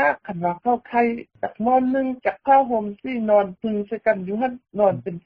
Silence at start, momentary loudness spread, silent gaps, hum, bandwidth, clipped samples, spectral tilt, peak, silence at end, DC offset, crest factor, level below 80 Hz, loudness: 0 s; 9 LU; none; none; 5 kHz; under 0.1%; -5.5 dB/octave; -6 dBFS; 0.05 s; under 0.1%; 16 dB; -60 dBFS; -22 LUFS